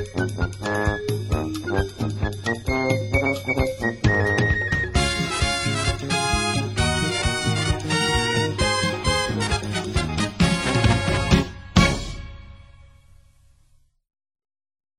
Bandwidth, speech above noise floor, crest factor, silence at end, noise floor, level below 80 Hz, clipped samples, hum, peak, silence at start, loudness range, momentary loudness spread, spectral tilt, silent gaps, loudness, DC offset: 16 kHz; 34 dB; 22 dB; 2.35 s; -58 dBFS; -32 dBFS; under 0.1%; none; -2 dBFS; 0 s; 3 LU; 7 LU; -4.5 dB/octave; none; -22 LUFS; under 0.1%